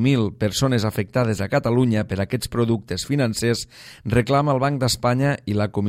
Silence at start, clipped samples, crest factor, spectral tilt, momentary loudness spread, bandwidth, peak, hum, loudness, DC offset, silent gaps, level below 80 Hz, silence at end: 0 s; under 0.1%; 16 dB; -6 dB/octave; 5 LU; 16 kHz; -4 dBFS; none; -21 LUFS; under 0.1%; none; -46 dBFS; 0 s